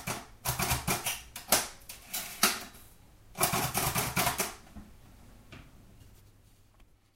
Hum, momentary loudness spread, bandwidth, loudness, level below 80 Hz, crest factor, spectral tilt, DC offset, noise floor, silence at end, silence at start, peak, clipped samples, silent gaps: none; 24 LU; 16.5 kHz; -30 LUFS; -52 dBFS; 28 dB; -2 dB/octave; under 0.1%; -61 dBFS; 1.05 s; 0 s; -8 dBFS; under 0.1%; none